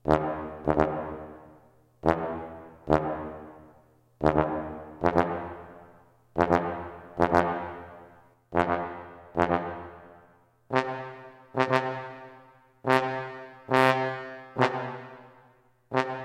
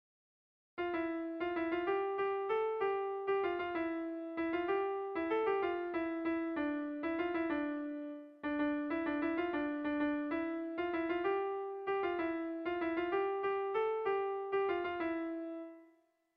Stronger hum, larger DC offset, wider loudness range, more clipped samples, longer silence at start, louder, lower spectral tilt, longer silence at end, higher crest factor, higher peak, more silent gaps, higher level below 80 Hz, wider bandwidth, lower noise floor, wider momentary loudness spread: neither; neither; first, 4 LU vs 1 LU; neither; second, 0.05 s vs 0.75 s; first, -28 LUFS vs -37 LUFS; about the same, -7 dB/octave vs -7.5 dB/octave; second, 0 s vs 0.5 s; first, 24 dB vs 14 dB; first, -4 dBFS vs -24 dBFS; neither; first, -50 dBFS vs -70 dBFS; first, 16.5 kHz vs 5.2 kHz; second, -61 dBFS vs -70 dBFS; first, 18 LU vs 5 LU